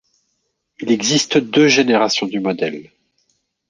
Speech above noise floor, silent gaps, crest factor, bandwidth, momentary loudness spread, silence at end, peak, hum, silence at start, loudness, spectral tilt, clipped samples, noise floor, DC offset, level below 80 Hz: 55 dB; none; 16 dB; 10 kHz; 12 LU; 0.9 s; -2 dBFS; none; 0.8 s; -16 LUFS; -3.5 dB/octave; under 0.1%; -70 dBFS; under 0.1%; -62 dBFS